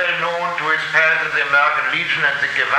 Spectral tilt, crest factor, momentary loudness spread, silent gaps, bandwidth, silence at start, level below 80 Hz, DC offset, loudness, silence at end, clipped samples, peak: -2.5 dB/octave; 16 dB; 5 LU; none; 15 kHz; 0 s; -60 dBFS; under 0.1%; -16 LUFS; 0 s; under 0.1%; -2 dBFS